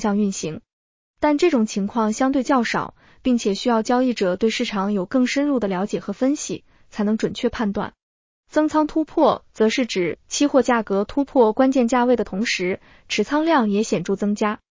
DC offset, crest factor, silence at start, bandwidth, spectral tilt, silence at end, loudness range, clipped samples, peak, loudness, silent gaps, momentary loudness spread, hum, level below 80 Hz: under 0.1%; 16 dB; 0 s; 7.6 kHz; -5 dB/octave; 0.25 s; 4 LU; under 0.1%; -4 dBFS; -21 LUFS; 0.73-1.14 s, 8.03-8.44 s; 8 LU; none; -52 dBFS